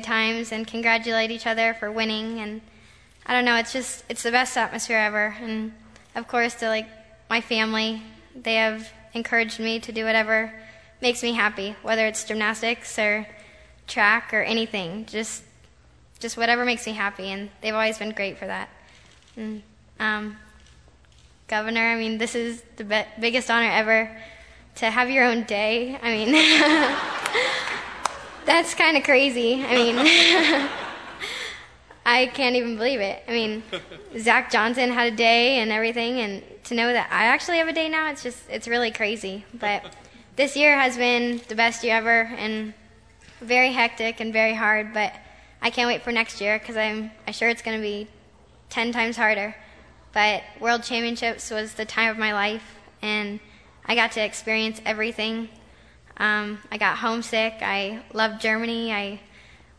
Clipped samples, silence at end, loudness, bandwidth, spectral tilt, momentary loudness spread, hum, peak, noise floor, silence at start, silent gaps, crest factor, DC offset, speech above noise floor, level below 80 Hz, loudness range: under 0.1%; 0.6 s; -22 LUFS; 11 kHz; -2.5 dB/octave; 14 LU; none; -2 dBFS; -55 dBFS; 0 s; none; 22 dB; under 0.1%; 31 dB; -58 dBFS; 7 LU